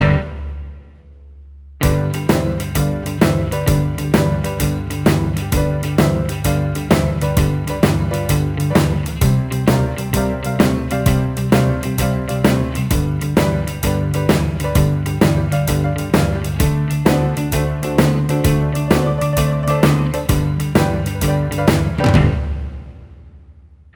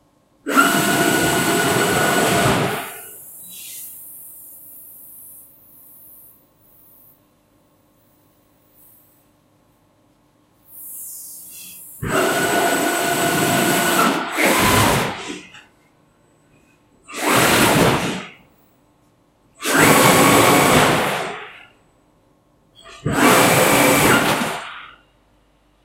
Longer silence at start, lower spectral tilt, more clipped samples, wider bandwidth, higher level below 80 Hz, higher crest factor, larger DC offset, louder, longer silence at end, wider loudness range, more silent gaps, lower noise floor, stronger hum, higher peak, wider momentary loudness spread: second, 0 s vs 0.45 s; first, -6.5 dB/octave vs -3.5 dB/octave; neither; first, 20 kHz vs 16 kHz; first, -26 dBFS vs -46 dBFS; about the same, 16 dB vs 20 dB; neither; about the same, -17 LUFS vs -16 LUFS; second, 0.45 s vs 1 s; second, 2 LU vs 20 LU; neither; second, -43 dBFS vs -58 dBFS; neither; about the same, 0 dBFS vs 0 dBFS; second, 4 LU vs 23 LU